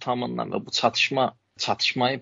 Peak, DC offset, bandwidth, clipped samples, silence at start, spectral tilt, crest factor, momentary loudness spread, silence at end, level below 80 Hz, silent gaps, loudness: -6 dBFS; under 0.1%; 7.8 kHz; under 0.1%; 0 s; -2 dB/octave; 20 dB; 8 LU; 0 s; -68 dBFS; none; -24 LUFS